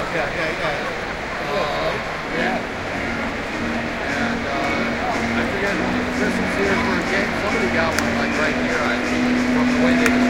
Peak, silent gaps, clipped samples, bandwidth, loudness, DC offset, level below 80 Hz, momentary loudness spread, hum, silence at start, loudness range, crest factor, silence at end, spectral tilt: -2 dBFS; none; under 0.1%; 16.5 kHz; -21 LUFS; under 0.1%; -40 dBFS; 6 LU; none; 0 s; 4 LU; 18 dB; 0 s; -4.5 dB/octave